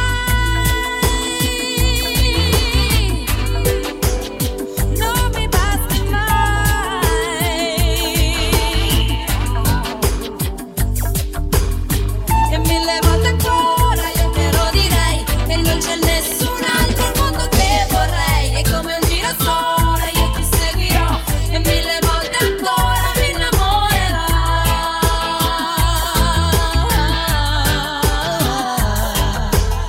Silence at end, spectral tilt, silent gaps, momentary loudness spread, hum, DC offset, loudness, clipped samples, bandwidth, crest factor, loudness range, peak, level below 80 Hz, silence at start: 0 s; -4 dB/octave; none; 4 LU; none; under 0.1%; -17 LUFS; under 0.1%; 16.5 kHz; 16 dB; 2 LU; 0 dBFS; -20 dBFS; 0 s